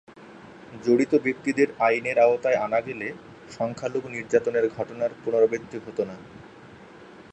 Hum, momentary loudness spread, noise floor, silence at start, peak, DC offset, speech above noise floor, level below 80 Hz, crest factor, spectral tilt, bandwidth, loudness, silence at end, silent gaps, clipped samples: none; 15 LU; -47 dBFS; 0.2 s; -6 dBFS; under 0.1%; 23 dB; -64 dBFS; 18 dB; -6 dB/octave; 8.8 kHz; -25 LUFS; 0.1 s; none; under 0.1%